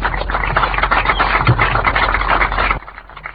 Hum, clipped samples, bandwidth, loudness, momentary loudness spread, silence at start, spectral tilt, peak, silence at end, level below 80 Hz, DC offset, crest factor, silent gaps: none; under 0.1%; 5.2 kHz; -15 LUFS; 6 LU; 0 s; -8.5 dB/octave; 0 dBFS; 0 s; -24 dBFS; 0.2%; 14 dB; none